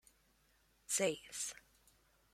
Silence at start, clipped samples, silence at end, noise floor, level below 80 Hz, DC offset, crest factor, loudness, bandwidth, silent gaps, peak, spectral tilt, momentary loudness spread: 0.9 s; under 0.1%; 0.8 s; -74 dBFS; -76 dBFS; under 0.1%; 22 dB; -39 LUFS; 16.5 kHz; none; -24 dBFS; -2 dB/octave; 10 LU